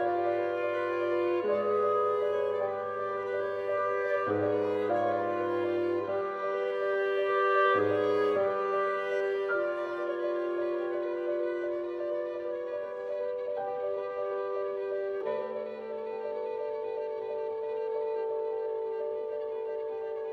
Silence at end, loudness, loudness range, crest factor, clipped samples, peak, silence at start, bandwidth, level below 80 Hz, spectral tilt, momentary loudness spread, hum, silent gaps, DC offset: 0 s; -31 LUFS; 6 LU; 16 dB; under 0.1%; -14 dBFS; 0 s; 6.4 kHz; -78 dBFS; -7 dB/octave; 8 LU; none; none; under 0.1%